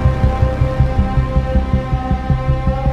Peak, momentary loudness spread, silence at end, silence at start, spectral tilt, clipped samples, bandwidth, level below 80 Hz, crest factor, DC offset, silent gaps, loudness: -2 dBFS; 3 LU; 0 s; 0 s; -9 dB/octave; under 0.1%; 6.6 kHz; -18 dBFS; 14 dB; under 0.1%; none; -17 LUFS